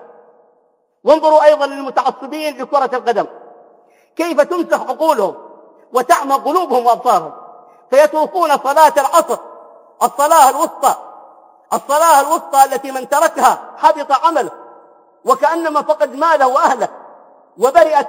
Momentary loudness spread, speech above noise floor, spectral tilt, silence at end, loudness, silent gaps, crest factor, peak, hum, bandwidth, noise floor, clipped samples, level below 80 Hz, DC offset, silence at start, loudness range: 12 LU; 46 dB; -2.5 dB/octave; 0 s; -14 LUFS; none; 14 dB; 0 dBFS; none; 17.5 kHz; -59 dBFS; 0.2%; -64 dBFS; under 0.1%; 1.05 s; 4 LU